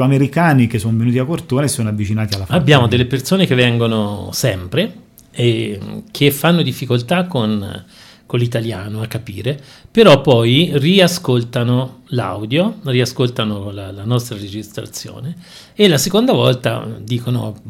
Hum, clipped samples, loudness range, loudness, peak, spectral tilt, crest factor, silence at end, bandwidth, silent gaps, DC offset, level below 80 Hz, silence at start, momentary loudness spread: none; 0.1%; 6 LU; -15 LUFS; 0 dBFS; -5.5 dB/octave; 16 dB; 0 s; 16.5 kHz; none; under 0.1%; -48 dBFS; 0 s; 16 LU